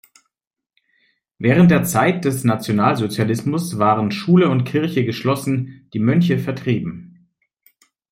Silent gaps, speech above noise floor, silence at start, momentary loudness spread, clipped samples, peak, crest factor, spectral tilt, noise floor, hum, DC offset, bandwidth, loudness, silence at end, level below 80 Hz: none; 68 dB; 1.4 s; 9 LU; under 0.1%; -2 dBFS; 16 dB; -6.5 dB/octave; -85 dBFS; none; under 0.1%; 16 kHz; -18 LUFS; 1.05 s; -54 dBFS